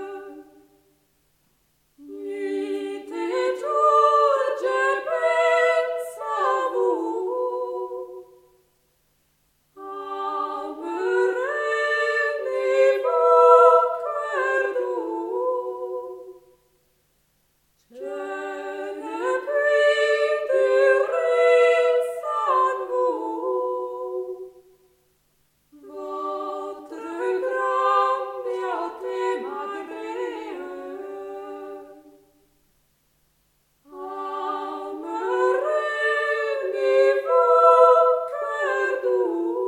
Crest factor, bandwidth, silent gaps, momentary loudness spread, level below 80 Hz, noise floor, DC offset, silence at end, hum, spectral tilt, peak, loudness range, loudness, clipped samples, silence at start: 22 dB; 11 kHz; none; 18 LU; -74 dBFS; -67 dBFS; under 0.1%; 0 s; none; -2.5 dB/octave; -2 dBFS; 15 LU; -22 LUFS; under 0.1%; 0 s